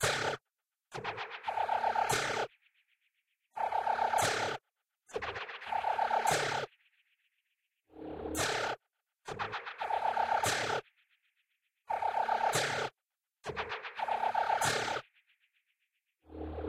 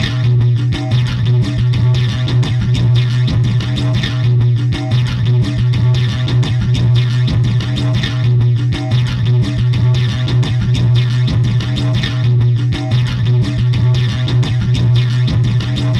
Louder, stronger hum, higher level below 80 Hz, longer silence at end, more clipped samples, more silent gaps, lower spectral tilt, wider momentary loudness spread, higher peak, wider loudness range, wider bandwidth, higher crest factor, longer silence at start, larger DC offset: second, -34 LUFS vs -14 LUFS; neither; second, -62 dBFS vs -30 dBFS; about the same, 0 s vs 0 s; neither; neither; second, -2.5 dB/octave vs -7 dB/octave; first, 14 LU vs 3 LU; second, -16 dBFS vs -2 dBFS; first, 3 LU vs 0 LU; first, 16 kHz vs 8.2 kHz; first, 20 dB vs 10 dB; about the same, 0 s vs 0 s; neither